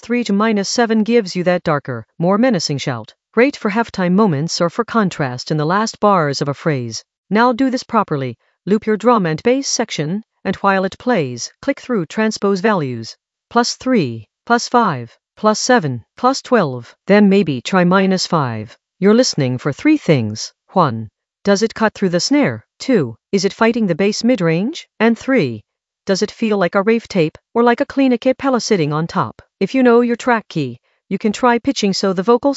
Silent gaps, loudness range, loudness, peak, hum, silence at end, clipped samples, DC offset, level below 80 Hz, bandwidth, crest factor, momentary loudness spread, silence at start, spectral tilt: 7.18-7.24 s; 3 LU; -16 LUFS; 0 dBFS; none; 0 s; under 0.1%; under 0.1%; -58 dBFS; 8.2 kHz; 16 dB; 10 LU; 0 s; -5.5 dB/octave